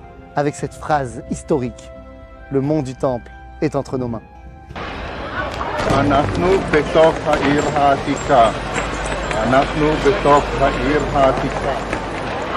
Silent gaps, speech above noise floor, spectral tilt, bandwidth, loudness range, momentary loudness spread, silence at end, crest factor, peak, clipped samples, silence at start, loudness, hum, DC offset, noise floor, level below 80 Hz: none; 21 dB; -5.5 dB/octave; 12 kHz; 8 LU; 14 LU; 0 s; 18 dB; 0 dBFS; under 0.1%; 0 s; -18 LUFS; none; under 0.1%; -37 dBFS; -32 dBFS